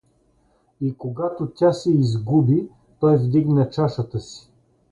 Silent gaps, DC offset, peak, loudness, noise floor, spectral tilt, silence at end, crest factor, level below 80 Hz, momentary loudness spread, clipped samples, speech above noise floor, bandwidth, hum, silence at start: none; under 0.1%; -6 dBFS; -21 LUFS; -62 dBFS; -9 dB/octave; 0.55 s; 16 dB; -54 dBFS; 11 LU; under 0.1%; 42 dB; 9.6 kHz; none; 0.8 s